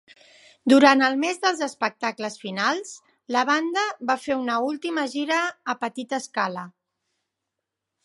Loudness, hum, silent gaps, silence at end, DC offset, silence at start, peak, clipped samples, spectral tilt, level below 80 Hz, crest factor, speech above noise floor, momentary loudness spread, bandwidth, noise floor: -23 LUFS; none; none; 1.35 s; under 0.1%; 0.65 s; -2 dBFS; under 0.1%; -3 dB/octave; -76 dBFS; 22 dB; 60 dB; 14 LU; 11.5 kHz; -83 dBFS